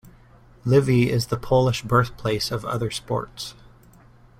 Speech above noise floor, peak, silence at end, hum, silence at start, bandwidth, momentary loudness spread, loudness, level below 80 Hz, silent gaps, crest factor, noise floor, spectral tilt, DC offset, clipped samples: 29 dB; -4 dBFS; 0.9 s; none; 0.05 s; 15.5 kHz; 13 LU; -22 LUFS; -46 dBFS; none; 20 dB; -51 dBFS; -6 dB/octave; under 0.1%; under 0.1%